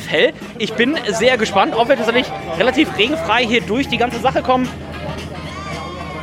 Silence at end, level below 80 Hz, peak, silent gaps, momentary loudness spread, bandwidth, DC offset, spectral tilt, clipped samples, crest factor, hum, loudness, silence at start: 0 s; -42 dBFS; -2 dBFS; none; 12 LU; 15.5 kHz; under 0.1%; -4.5 dB/octave; under 0.1%; 16 dB; none; -17 LUFS; 0 s